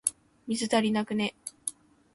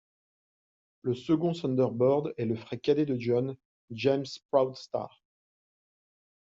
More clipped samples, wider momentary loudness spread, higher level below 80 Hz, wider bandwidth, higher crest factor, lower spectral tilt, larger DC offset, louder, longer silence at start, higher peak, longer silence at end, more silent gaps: neither; about the same, 11 LU vs 11 LU; about the same, -70 dBFS vs -70 dBFS; first, 12 kHz vs 7.8 kHz; about the same, 22 dB vs 20 dB; second, -3.5 dB/octave vs -6.5 dB/octave; neither; about the same, -30 LUFS vs -29 LUFS; second, 0.05 s vs 1.05 s; about the same, -8 dBFS vs -10 dBFS; second, 0.45 s vs 1.5 s; second, none vs 3.65-3.88 s, 4.45-4.49 s